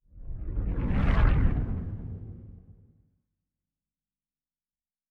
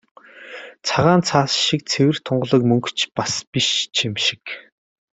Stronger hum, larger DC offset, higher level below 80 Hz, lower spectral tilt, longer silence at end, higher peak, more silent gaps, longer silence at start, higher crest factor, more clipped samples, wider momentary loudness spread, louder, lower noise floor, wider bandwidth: neither; neither; first, -32 dBFS vs -56 dBFS; first, -9.5 dB/octave vs -4 dB/octave; first, 2.4 s vs 0.6 s; second, -10 dBFS vs -2 dBFS; second, none vs 3.47-3.52 s; second, 0.15 s vs 0.35 s; about the same, 20 dB vs 20 dB; neither; first, 20 LU vs 17 LU; second, -29 LUFS vs -19 LUFS; first, under -90 dBFS vs -38 dBFS; second, 4.8 kHz vs 8.4 kHz